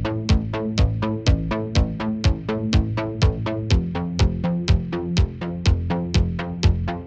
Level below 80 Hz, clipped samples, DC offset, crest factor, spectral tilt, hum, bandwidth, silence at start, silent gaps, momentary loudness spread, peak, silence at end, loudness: -26 dBFS; under 0.1%; under 0.1%; 14 dB; -6.5 dB/octave; none; 8.4 kHz; 0 s; none; 3 LU; -6 dBFS; 0 s; -22 LUFS